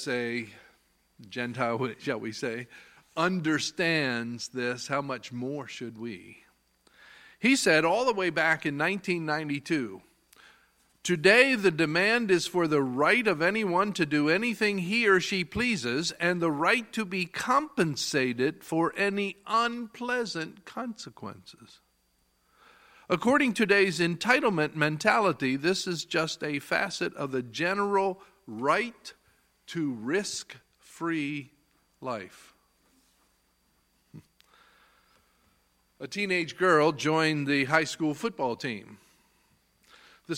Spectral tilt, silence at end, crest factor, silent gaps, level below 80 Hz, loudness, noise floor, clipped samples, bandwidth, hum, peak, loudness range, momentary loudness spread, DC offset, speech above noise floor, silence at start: -4.5 dB/octave; 0 s; 22 dB; none; -68 dBFS; -27 LUFS; -71 dBFS; under 0.1%; 16.5 kHz; none; -6 dBFS; 10 LU; 15 LU; under 0.1%; 43 dB; 0 s